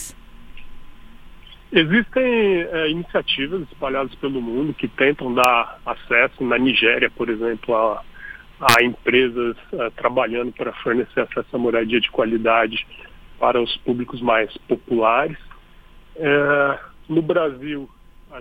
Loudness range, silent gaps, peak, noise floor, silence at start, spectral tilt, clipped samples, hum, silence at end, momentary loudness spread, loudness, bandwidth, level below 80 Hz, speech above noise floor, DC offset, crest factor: 3 LU; none; 0 dBFS; -45 dBFS; 0 s; -4.5 dB/octave; under 0.1%; none; 0 s; 11 LU; -20 LUFS; 17 kHz; -46 dBFS; 26 dB; under 0.1%; 20 dB